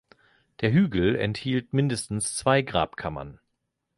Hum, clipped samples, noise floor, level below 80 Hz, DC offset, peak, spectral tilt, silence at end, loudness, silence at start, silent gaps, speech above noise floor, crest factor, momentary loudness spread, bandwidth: none; under 0.1%; -79 dBFS; -50 dBFS; under 0.1%; -6 dBFS; -5.5 dB/octave; 0.65 s; -25 LUFS; 0.6 s; none; 54 dB; 20 dB; 12 LU; 11.5 kHz